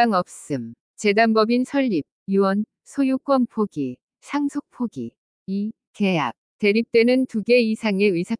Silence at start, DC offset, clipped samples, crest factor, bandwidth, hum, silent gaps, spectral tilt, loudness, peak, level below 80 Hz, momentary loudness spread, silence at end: 0 s; under 0.1%; under 0.1%; 16 dB; 10.5 kHz; none; 0.81-0.94 s, 2.12-2.26 s, 4.03-4.08 s, 5.18-5.46 s, 5.87-5.94 s, 6.38-6.59 s; -6 dB/octave; -22 LUFS; -4 dBFS; -70 dBFS; 12 LU; 0.05 s